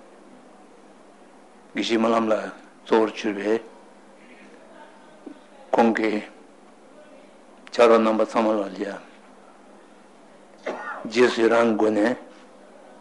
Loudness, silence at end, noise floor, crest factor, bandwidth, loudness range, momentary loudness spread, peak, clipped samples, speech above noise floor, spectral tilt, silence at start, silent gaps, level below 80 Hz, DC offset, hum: -22 LUFS; 0.75 s; -50 dBFS; 22 dB; 11.5 kHz; 5 LU; 18 LU; -2 dBFS; under 0.1%; 30 dB; -5 dB/octave; 1.75 s; none; -76 dBFS; 0.1%; none